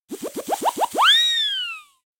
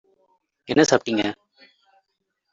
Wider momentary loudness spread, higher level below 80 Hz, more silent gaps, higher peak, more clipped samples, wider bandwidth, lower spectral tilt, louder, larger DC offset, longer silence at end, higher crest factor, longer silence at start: first, 18 LU vs 12 LU; second, -72 dBFS vs -62 dBFS; neither; second, -6 dBFS vs -2 dBFS; neither; first, 17 kHz vs 8 kHz; second, 0.5 dB/octave vs -4 dB/octave; first, -18 LUFS vs -21 LUFS; neither; second, 0.4 s vs 1.2 s; second, 16 dB vs 22 dB; second, 0.1 s vs 0.7 s